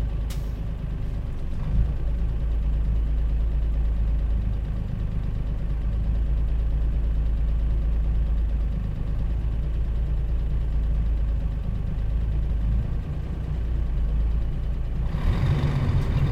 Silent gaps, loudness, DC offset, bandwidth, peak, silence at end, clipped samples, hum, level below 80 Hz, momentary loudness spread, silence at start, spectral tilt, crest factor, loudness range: none; -28 LUFS; 0.1%; 5.2 kHz; -10 dBFS; 0 s; under 0.1%; none; -24 dBFS; 5 LU; 0 s; -8.5 dB/octave; 12 dB; 1 LU